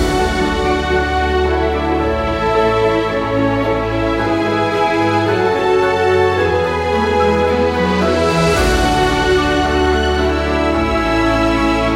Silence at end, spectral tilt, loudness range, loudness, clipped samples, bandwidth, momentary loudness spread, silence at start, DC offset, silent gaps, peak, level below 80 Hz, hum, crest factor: 0 s; -5.5 dB/octave; 2 LU; -15 LUFS; under 0.1%; 16 kHz; 3 LU; 0 s; under 0.1%; none; -2 dBFS; -26 dBFS; none; 12 dB